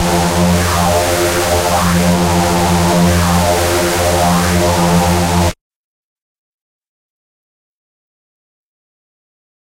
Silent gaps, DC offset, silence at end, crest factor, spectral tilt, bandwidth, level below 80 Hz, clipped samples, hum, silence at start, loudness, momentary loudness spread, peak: none; 0.7%; 4.15 s; 12 dB; -4.5 dB/octave; 16 kHz; -30 dBFS; under 0.1%; none; 0 s; -12 LUFS; 2 LU; -2 dBFS